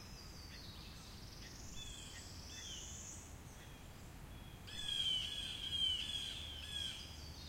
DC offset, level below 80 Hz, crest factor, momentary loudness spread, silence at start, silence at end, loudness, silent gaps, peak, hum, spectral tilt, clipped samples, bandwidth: under 0.1%; -58 dBFS; 18 dB; 18 LU; 0 s; 0 s; -43 LUFS; none; -28 dBFS; none; -2 dB/octave; under 0.1%; 16 kHz